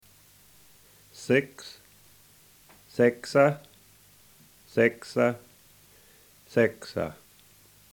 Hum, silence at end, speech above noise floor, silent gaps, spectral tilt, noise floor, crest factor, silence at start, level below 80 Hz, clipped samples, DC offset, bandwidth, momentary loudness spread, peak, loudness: none; 0.8 s; 32 dB; none; -6 dB/octave; -57 dBFS; 22 dB; 1.2 s; -68 dBFS; under 0.1%; under 0.1%; 20 kHz; 19 LU; -8 dBFS; -26 LUFS